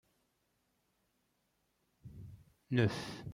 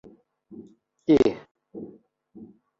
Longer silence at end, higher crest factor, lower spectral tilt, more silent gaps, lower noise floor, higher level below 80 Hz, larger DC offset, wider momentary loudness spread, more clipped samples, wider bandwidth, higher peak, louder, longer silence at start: second, 0 s vs 0.35 s; about the same, 24 dB vs 20 dB; about the same, -6.5 dB/octave vs -7.5 dB/octave; second, none vs 1.51-1.55 s; first, -80 dBFS vs -52 dBFS; second, -68 dBFS vs -58 dBFS; neither; second, 23 LU vs 27 LU; neither; first, 14 kHz vs 7.6 kHz; second, -16 dBFS vs -8 dBFS; second, -35 LUFS vs -22 LUFS; first, 2.05 s vs 0.5 s